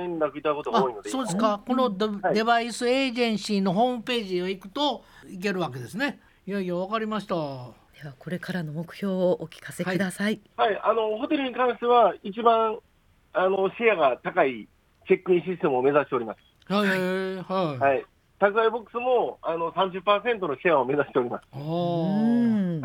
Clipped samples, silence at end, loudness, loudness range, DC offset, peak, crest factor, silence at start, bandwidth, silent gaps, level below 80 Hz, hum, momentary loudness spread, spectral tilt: under 0.1%; 0 s; -25 LUFS; 6 LU; under 0.1%; -6 dBFS; 20 dB; 0 s; 18 kHz; none; -64 dBFS; none; 10 LU; -5.5 dB/octave